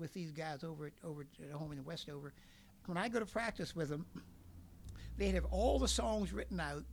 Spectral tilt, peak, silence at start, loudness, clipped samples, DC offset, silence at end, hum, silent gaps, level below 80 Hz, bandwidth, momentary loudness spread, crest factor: -5 dB/octave; -22 dBFS; 0 s; -41 LUFS; under 0.1%; under 0.1%; 0 s; none; none; -48 dBFS; 19.5 kHz; 19 LU; 18 dB